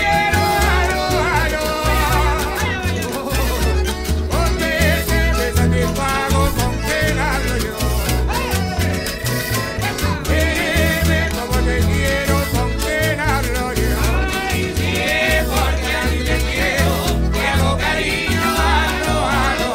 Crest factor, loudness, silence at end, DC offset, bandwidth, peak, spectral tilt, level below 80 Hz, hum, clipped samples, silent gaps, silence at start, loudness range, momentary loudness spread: 14 dB; -18 LUFS; 0 s; under 0.1%; 16.5 kHz; -2 dBFS; -4.5 dB/octave; -22 dBFS; none; under 0.1%; none; 0 s; 2 LU; 4 LU